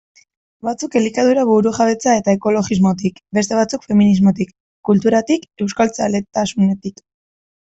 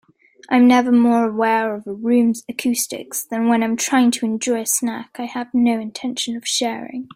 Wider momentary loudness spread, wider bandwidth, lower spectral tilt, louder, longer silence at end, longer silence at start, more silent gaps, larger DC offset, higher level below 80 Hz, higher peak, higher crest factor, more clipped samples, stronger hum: about the same, 10 LU vs 11 LU; second, 8.2 kHz vs 16.5 kHz; first, -6 dB/octave vs -3 dB/octave; about the same, -16 LUFS vs -18 LUFS; first, 0.75 s vs 0.1 s; first, 0.65 s vs 0.5 s; first, 4.60-4.83 s vs none; neither; first, -52 dBFS vs -66 dBFS; about the same, -2 dBFS vs -2 dBFS; about the same, 14 dB vs 16 dB; neither; neither